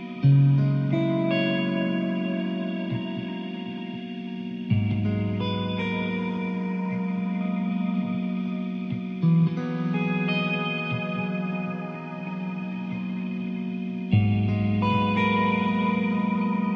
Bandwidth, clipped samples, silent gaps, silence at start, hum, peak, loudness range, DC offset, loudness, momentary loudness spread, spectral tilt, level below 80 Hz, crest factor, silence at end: 6 kHz; under 0.1%; none; 0 s; none; -10 dBFS; 5 LU; under 0.1%; -26 LUFS; 10 LU; -9 dB/octave; -56 dBFS; 16 dB; 0 s